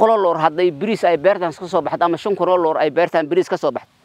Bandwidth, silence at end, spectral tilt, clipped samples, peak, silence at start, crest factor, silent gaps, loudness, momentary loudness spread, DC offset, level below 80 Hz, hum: 11 kHz; 0.25 s; -6 dB/octave; under 0.1%; 0 dBFS; 0 s; 18 dB; none; -18 LUFS; 6 LU; under 0.1%; -66 dBFS; none